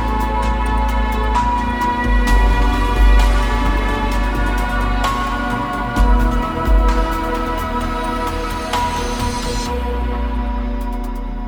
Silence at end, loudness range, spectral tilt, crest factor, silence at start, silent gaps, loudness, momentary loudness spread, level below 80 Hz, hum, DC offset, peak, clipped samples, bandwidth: 0 s; 4 LU; -5.5 dB/octave; 14 dB; 0 s; none; -19 LUFS; 6 LU; -18 dBFS; none; under 0.1%; -2 dBFS; under 0.1%; 16 kHz